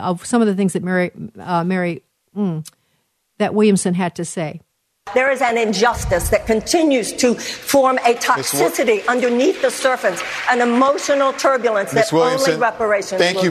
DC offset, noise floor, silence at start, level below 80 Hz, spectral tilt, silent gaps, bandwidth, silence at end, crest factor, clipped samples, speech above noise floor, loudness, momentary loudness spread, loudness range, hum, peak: under 0.1%; -67 dBFS; 0 s; -42 dBFS; -4.5 dB/octave; none; 13.5 kHz; 0 s; 16 dB; under 0.1%; 50 dB; -17 LUFS; 8 LU; 5 LU; none; -2 dBFS